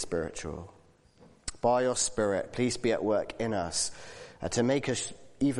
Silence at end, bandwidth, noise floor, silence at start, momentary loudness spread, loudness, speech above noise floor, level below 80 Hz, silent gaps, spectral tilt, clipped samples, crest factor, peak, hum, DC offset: 0 s; 11.5 kHz; -59 dBFS; 0 s; 15 LU; -30 LUFS; 29 dB; -56 dBFS; none; -4 dB/octave; under 0.1%; 18 dB; -14 dBFS; none; under 0.1%